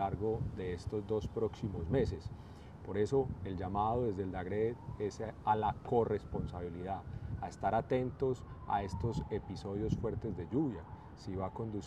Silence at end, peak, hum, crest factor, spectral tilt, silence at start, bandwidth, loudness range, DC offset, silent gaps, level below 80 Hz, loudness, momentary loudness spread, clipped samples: 0 s; -18 dBFS; none; 18 dB; -8 dB/octave; 0 s; 10.5 kHz; 2 LU; under 0.1%; none; -52 dBFS; -37 LUFS; 9 LU; under 0.1%